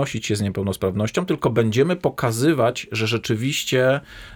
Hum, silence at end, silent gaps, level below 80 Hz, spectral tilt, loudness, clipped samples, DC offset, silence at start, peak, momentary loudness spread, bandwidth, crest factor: none; 0 s; none; -52 dBFS; -5.5 dB/octave; -21 LUFS; under 0.1%; under 0.1%; 0 s; -6 dBFS; 5 LU; over 20 kHz; 16 dB